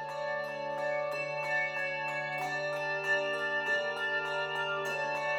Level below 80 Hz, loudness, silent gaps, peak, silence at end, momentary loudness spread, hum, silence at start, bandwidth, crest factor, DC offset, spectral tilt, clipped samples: -78 dBFS; -32 LUFS; none; -20 dBFS; 0 s; 5 LU; none; 0 s; 18.5 kHz; 14 dB; under 0.1%; -3.5 dB/octave; under 0.1%